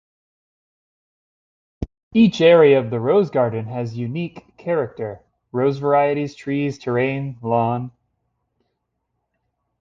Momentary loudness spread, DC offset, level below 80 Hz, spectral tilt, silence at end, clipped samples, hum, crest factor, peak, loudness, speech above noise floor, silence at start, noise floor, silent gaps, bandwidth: 18 LU; under 0.1%; -50 dBFS; -7.5 dB/octave; 1.9 s; under 0.1%; none; 18 dB; -2 dBFS; -19 LUFS; 57 dB; 1.8 s; -75 dBFS; 2.03-2.11 s; 7.4 kHz